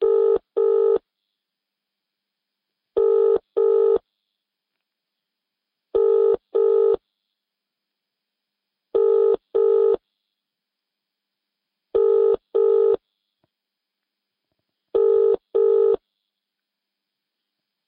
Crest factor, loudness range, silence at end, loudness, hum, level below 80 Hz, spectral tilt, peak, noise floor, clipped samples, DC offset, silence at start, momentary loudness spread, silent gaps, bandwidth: 12 dB; 0 LU; 1.9 s; -20 LUFS; none; -64 dBFS; -9.5 dB/octave; -10 dBFS; -84 dBFS; under 0.1%; under 0.1%; 0 s; 8 LU; none; 3.9 kHz